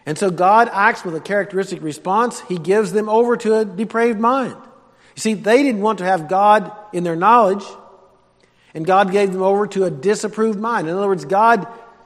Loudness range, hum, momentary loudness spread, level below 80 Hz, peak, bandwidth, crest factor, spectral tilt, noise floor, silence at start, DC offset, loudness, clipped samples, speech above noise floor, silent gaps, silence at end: 2 LU; none; 11 LU; -68 dBFS; 0 dBFS; 13.5 kHz; 18 dB; -5.5 dB/octave; -55 dBFS; 0.05 s; under 0.1%; -17 LUFS; under 0.1%; 39 dB; none; 0.25 s